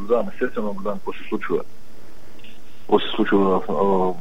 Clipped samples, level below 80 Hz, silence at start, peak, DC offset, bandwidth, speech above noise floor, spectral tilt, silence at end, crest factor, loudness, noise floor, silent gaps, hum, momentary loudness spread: under 0.1%; -52 dBFS; 0 s; -2 dBFS; 6%; 16 kHz; 26 dB; -7 dB/octave; 0 s; 20 dB; -22 LUFS; -47 dBFS; none; none; 10 LU